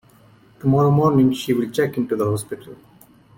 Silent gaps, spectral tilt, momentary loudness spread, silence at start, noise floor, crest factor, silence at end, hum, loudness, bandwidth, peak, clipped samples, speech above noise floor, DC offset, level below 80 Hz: none; -7.5 dB/octave; 11 LU; 0.65 s; -51 dBFS; 14 dB; 0.65 s; none; -19 LUFS; 17 kHz; -6 dBFS; under 0.1%; 33 dB; under 0.1%; -52 dBFS